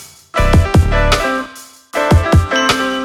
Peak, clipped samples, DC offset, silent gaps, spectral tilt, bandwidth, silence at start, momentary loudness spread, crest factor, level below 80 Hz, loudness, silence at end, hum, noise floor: 0 dBFS; under 0.1%; under 0.1%; none; -5.5 dB/octave; 15 kHz; 0 s; 10 LU; 14 dB; -20 dBFS; -14 LUFS; 0 s; none; -36 dBFS